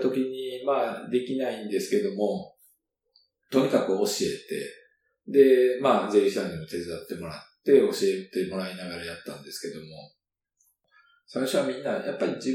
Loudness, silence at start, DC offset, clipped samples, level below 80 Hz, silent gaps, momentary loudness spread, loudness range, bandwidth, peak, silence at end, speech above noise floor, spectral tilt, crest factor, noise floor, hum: -26 LUFS; 0 s; under 0.1%; under 0.1%; -68 dBFS; none; 16 LU; 10 LU; 16 kHz; -6 dBFS; 0 s; 48 dB; -5 dB/octave; 20 dB; -73 dBFS; none